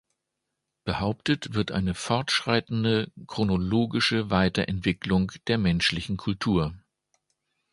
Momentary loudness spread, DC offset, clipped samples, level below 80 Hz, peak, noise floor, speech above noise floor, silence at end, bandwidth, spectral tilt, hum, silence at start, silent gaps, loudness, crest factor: 6 LU; under 0.1%; under 0.1%; -46 dBFS; -6 dBFS; -83 dBFS; 57 dB; 0.95 s; 11.5 kHz; -5.5 dB/octave; none; 0.85 s; none; -26 LUFS; 22 dB